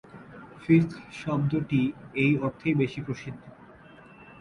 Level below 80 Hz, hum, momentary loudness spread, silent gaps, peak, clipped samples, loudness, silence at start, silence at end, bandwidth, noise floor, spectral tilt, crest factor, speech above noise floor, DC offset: -58 dBFS; none; 21 LU; none; -8 dBFS; under 0.1%; -27 LUFS; 0.15 s; 0.15 s; 10.5 kHz; -50 dBFS; -8 dB/octave; 20 dB; 24 dB; under 0.1%